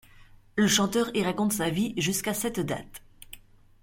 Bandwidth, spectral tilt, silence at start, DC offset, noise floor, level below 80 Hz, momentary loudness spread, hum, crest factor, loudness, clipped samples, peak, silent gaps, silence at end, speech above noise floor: 16.5 kHz; -3.5 dB/octave; 0.2 s; under 0.1%; -53 dBFS; -56 dBFS; 24 LU; none; 20 dB; -27 LUFS; under 0.1%; -10 dBFS; none; 0.45 s; 26 dB